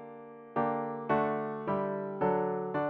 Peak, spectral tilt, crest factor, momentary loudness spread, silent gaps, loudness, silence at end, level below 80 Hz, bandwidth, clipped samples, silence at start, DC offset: -16 dBFS; -10 dB/octave; 16 dB; 7 LU; none; -32 LUFS; 0 s; -68 dBFS; 5 kHz; under 0.1%; 0 s; under 0.1%